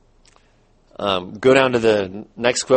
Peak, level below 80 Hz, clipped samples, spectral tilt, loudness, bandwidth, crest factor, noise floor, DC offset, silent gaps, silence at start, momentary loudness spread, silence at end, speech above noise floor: 0 dBFS; -52 dBFS; under 0.1%; -4 dB/octave; -18 LUFS; 8.8 kHz; 18 dB; -56 dBFS; under 0.1%; none; 1 s; 9 LU; 0 s; 39 dB